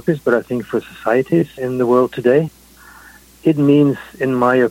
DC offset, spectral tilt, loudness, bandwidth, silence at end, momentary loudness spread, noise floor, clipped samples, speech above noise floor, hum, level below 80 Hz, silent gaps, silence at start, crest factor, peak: under 0.1%; -8 dB/octave; -16 LUFS; 16.5 kHz; 0 s; 9 LU; -43 dBFS; under 0.1%; 28 dB; none; -52 dBFS; none; 0.05 s; 16 dB; -2 dBFS